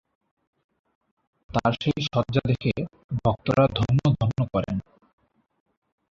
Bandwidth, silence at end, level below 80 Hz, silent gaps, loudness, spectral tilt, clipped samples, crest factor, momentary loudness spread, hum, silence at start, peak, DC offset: 7.4 kHz; 1.3 s; -48 dBFS; 3.04-3.09 s; -25 LUFS; -7.5 dB/octave; under 0.1%; 20 dB; 9 LU; none; 1.55 s; -6 dBFS; under 0.1%